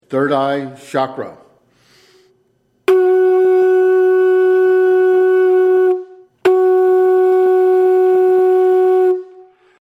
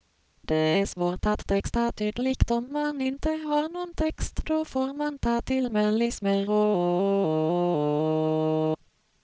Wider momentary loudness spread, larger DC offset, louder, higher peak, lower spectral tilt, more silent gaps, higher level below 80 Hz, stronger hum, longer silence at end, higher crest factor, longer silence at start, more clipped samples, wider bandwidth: first, 9 LU vs 5 LU; neither; first, -13 LUFS vs -26 LUFS; first, -2 dBFS vs -6 dBFS; about the same, -7 dB/octave vs -6.5 dB/octave; neither; second, -70 dBFS vs -38 dBFS; neither; about the same, 0.6 s vs 0.5 s; second, 12 dB vs 20 dB; second, 0.1 s vs 0.5 s; neither; second, 5.2 kHz vs 8 kHz